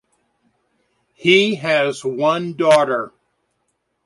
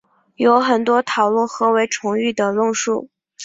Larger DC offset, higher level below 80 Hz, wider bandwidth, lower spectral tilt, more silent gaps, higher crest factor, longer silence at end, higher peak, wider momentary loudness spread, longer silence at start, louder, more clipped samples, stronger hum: neither; about the same, -66 dBFS vs -66 dBFS; first, 11.5 kHz vs 7.8 kHz; about the same, -4.5 dB/octave vs -3.5 dB/octave; neither; about the same, 18 dB vs 16 dB; first, 1 s vs 0 s; about the same, -2 dBFS vs -2 dBFS; first, 8 LU vs 5 LU; first, 1.2 s vs 0.4 s; about the same, -17 LUFS vs -18 LUFS; neither; neither